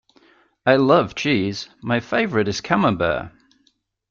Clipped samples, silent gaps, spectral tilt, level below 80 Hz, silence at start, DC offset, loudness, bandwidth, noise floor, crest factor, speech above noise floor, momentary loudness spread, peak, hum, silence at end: under 0.1%; none; -5.5 dB/octave; -52 dBFS; 0.65 s; under 0.1%; -20 LUFS; 7.6 kHz; -65 dBFS; 18 dB; 45 dB; 11 LU; -2 dBFS; none; 0.8 s